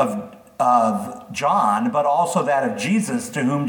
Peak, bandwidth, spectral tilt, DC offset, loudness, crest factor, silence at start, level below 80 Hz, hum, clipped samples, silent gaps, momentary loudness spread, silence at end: -4 dBFS; 19 kHz; -5.5 dB/octave; under 0.1%; -20 LUFS; 14 dB; 0 s; -68 dBFS; none; under 0.1%; none; 9 LU; 0 s